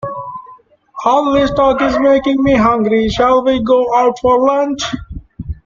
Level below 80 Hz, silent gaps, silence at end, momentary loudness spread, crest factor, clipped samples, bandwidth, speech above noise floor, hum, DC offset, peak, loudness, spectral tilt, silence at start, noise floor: -34 dBFS; none; 0.1 s; 17 LU; 12 dB; under 0.1%; 7.4 kHz; 30 dB; none; under 0.1%; 0 dBFS; -13 LUFS; -5.5 dB/octave; 0.05 s; -42 dBFS